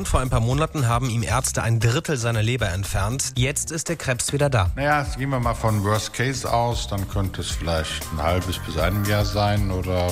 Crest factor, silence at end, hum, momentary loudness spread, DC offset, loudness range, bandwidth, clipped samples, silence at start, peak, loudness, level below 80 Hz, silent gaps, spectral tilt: 16 dB; 0 s; none; 5 LU; under 0.1%; 2 LU; 16 kHz; under 0.1%; 0 s; -6 dBFS; -23 LUFS; -32 dBFS; none; -4.5 dB/octave